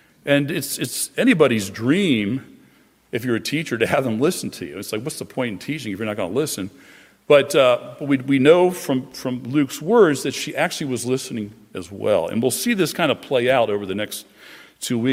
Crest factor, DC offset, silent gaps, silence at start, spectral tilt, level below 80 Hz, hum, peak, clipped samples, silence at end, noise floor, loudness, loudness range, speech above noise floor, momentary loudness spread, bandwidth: 18 dB; under 0.1%; none; 0.25 s; -4.5 dB/octave; -64 dBFS; none; -2 dBFS; under 0.1%; 0 s; -55 dBFS; -20 LUFS; 5 LU; 35 dB; 13 LU; 16 kHz